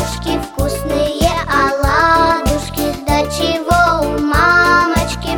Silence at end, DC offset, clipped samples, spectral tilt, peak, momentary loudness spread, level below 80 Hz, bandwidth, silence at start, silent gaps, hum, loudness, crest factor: 0 s; under 0.1%; under 0.1%; -4.5 dB/octave; 0 dBFS; 9 LU; -26 dBFS; 19.5 kHz; 0 s; none; none; -14 LUFS; 14 dB